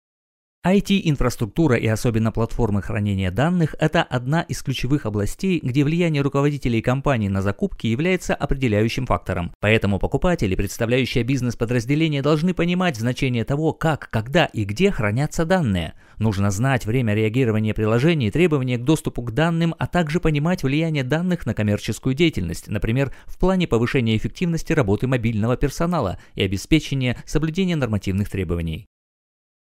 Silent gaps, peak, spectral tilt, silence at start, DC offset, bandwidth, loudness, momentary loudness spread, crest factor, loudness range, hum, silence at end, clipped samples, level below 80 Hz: 9.55-9.60 s; -2 dBFS; -6.5 dB/octave; 0.65 s; under 0.1%; 16 kHz; -21 LUFS; 5 LU; 20 dB; 2 LU; none; 0.8 s; under 0.1%; -34 dBFS